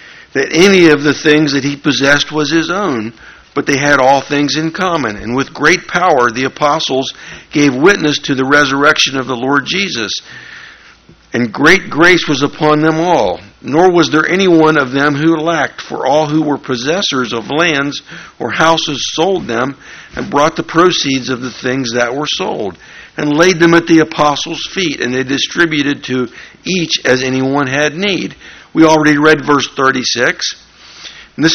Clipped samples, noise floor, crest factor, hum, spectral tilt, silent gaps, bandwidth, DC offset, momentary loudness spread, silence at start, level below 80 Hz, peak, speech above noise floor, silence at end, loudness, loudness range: 0.3%; -42 dBFS; 12 dB; none; -4 dB/octave; none; 10.5 kHz; under 0.1%; 12 LU; 0 s; -46 dBFS; 0 dBFS; 30 dB; 0 s; -12 LUFS; 3 LU